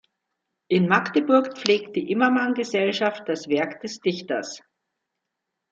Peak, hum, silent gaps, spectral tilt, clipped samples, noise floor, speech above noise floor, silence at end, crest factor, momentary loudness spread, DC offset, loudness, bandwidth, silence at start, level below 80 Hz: -2 dBFS; none; none; -5 dB/octave; under 0.1%; -82 dBFS; 59 dB; 1.15 s; 22 dB; 10 LU; under 0.1%; -23 LUFS; 8 kHz; 0.7 s; -72 dBFS